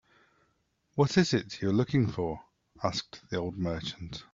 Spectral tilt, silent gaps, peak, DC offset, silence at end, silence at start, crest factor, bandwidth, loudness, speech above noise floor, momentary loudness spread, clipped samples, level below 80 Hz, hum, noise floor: -6 dB/octave; none; -10 dBFS; under 0.1%; 0.1 s; 0.95 s; 22 dB; 7.8 kHz; -30 LUFS; 44 dB; 12 LU; under 0.1%; -58 dBFS; none; -74 dBFS